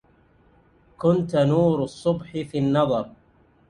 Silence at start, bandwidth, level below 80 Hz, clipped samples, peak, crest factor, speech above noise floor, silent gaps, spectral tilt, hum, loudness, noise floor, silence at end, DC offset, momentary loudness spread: 1 s; 10.5 kHz; -54 dBFS; under 0.1%; -6 dBFS; 18 dB; 37 dB; none; -8 dB/octave; none; -23 LUFS; -58 dBFS; 0.6 s; under 0.1%; 9 LU